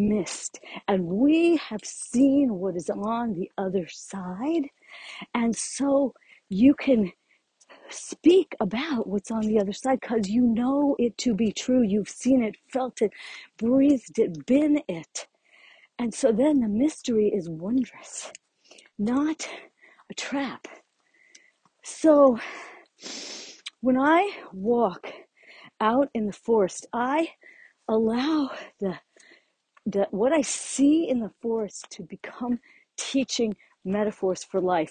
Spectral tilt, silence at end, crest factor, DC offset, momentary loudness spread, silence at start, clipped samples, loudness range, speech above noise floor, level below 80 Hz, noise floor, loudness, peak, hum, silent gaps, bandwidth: -5 dB/octave; 0 s; 18 dB; under 0.1%; 17 LU; 0 s; under 0.1%; 5 LU; 40 dB; -62 dBFS; -64 dBFS; -25 LUFS; -6 dBFS; none; none; 9.8 kHz